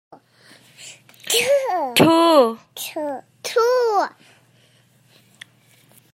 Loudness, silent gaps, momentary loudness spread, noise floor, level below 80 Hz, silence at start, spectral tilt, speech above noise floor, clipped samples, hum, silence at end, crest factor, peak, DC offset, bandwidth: -18 LUFS; none; 25 LU; -56 dBFS; -68 dBFS; 0.8 s; -3.5 dB/octave; 38 dB; under 0.1%; none; 2.05 s; 20 dB; -2 dBFS; under 0.1%; 16 kHz